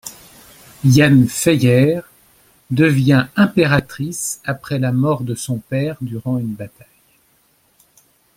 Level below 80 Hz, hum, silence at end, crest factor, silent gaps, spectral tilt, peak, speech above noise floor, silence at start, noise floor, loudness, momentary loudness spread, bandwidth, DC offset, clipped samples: -50 dBFS; none; 1.7 s; 16 dB; none; -6 dB/octave; 0 dBFS; 43 dB; 0.05 s; -58 dBFS; -16 LUFS; 13 LU; 16.5 kHz; under 0.1%; under 0.1%